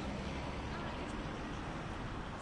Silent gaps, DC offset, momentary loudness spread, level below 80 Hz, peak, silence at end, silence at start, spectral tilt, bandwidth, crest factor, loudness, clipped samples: none; under 0.1%; 2 LU; -48 dBFS; -30 dBFS; 0 s; 0 s; -6 dB/octave; 11.5 kHz; 12 dB; -42 LUFS; under 0.1%